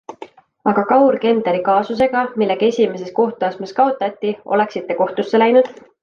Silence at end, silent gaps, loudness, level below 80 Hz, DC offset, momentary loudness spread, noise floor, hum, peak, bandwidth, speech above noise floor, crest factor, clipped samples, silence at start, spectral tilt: 0.3 s; none; -17 LUFS; -60 dBFS; under 0.1%; 8 LU; -40 dBFS; none; -2 dBFS; 7 kHz; 23 dB; 16 dB; under 0.1%; 0.1 s; -6.5 dB/octave